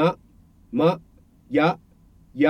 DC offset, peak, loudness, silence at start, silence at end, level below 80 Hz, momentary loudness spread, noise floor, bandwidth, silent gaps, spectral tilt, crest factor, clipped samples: under 0.1%; -6 dBFS; -24 LUFS; 0 s; 0 s; -58 dBFS; 16 LU; -54 dBFS; 9.2 kHz; none; -8 dB/octave; 18 dB; under 0.1%